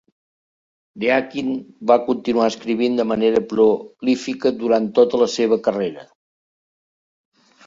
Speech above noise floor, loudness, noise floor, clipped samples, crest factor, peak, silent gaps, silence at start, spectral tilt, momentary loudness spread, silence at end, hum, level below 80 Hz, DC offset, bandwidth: over 72 dB; -19 LUFS; under -90 dBFS; under 0.1%; 18 dB; -2 dBFS; none; 0.95 s; -5 dB/octave; 8 LU; 1.65 s; none; -62 dBFS; under 0.1%; 7.8 kHz